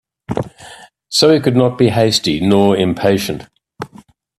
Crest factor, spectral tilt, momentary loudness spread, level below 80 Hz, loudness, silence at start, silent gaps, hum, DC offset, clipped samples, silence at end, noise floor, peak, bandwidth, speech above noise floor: 16 dB; -5 dB/octave; 20 LU; -48 dBFS; -14 LUFS; 0.3 s; none; none; under 0.1%; under 0.1%; 0.5 s; -44 dBFS; 0 dBFS; 14.5 kHz; 31 dB